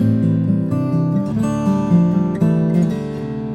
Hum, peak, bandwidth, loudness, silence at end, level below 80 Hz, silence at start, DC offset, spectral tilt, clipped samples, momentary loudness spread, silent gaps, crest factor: none; -4 dBFS; 8.8 kHz; -17 LUFS; 0 s; -44 dBFS; 0 s; under 0.1%; -9.5 dB/octave; under 0.1%; 5 LU; none; 12 dB